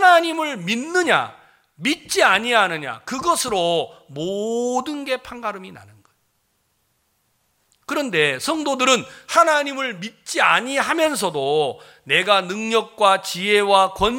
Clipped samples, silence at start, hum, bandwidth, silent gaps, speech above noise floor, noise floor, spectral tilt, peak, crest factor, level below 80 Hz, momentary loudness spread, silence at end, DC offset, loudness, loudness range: under 0.1%; 0 s; none; 17 kHz; none; 48 dB; -68 dBFS; -2.5 dB/octave; 0 dBFS; 20 dB; -54 dBFS; 12 LU; 0 s; under 0.1%; -19 LUFS; 9 LU